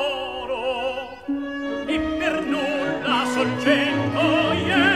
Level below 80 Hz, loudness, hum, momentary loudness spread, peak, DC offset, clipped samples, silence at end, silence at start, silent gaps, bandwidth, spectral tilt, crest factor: -48 dBFS; -22 LUFS; none; 9 LU; -6 dBFS; 0.2%; under 0.1%; 0 s; 0 s; none; 13 kHz; -5 dB/octave; 16 dB